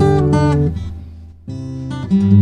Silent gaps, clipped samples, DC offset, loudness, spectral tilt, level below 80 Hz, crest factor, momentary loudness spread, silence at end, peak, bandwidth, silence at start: none; under 0.1%; 0.2%; -16 LUFS; -9 dB/octave; -30 dBFS; 14 dB; 20 LU; 0 s; 0 dBFS; 10 kHz; 0 s